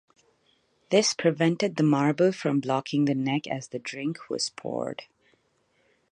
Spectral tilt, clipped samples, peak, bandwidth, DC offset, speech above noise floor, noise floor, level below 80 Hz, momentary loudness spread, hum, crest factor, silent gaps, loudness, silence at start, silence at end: -5 dB/octave; under 0.1%; -6 dBFS; 10.5 kHz; under 0.1%; 44 dB; -69 dBFS; -74 dBFS; 10 LU; none; 22 dB; none; -26 LUFS; 0.9 s; 1.1 s